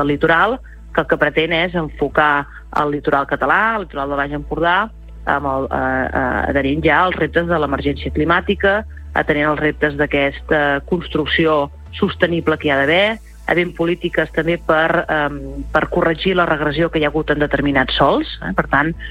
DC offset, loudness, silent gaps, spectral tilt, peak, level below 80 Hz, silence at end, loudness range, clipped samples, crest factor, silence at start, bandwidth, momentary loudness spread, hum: under 0.1%; -17 LUFS; none; -7 dB/octave; -2 dBFS; -34 dBFS; 0 s; 1 LU; under 0.1%; 16 dB; 0 s; 13.5 kHz; 7 LU; none